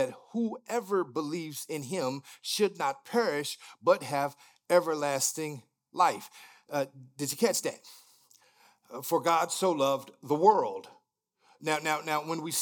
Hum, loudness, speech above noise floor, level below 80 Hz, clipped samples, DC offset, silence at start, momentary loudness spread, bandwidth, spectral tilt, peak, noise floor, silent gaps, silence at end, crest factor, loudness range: none; -30 LUFS; 43 dB; under -90 dBFS; under 0.1%; under 0.1%; 0 s; 12 LU; 19.5 kHz; -3.5 dB/octave; -8 dBFS; -73 dBFS; none; 0 s; 22 dB; 4 LU